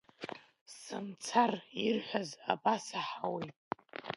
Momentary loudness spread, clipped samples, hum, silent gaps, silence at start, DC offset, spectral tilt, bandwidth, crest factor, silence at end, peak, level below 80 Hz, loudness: 16 LU; under 0.1%; none; 0.61-0.66 s, 3.56-3.71 s; 0.2 s; under 0.1%; -4 dB/octave; 11.5 kHz; 22 dB; 0 s; -14 dBFS; -82 dBFS; -36 LUFS